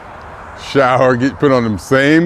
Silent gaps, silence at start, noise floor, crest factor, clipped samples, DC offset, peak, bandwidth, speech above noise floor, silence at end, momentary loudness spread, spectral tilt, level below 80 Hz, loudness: none; 0 s; -32 dBFS; 14 dB; under 0.1%; under 0.1%; 0 dBFS; 14.5 kHz; 20 dB; 0 s; 21 LU; -6.5 dB/octave; -44 dBFS; -13 LUFS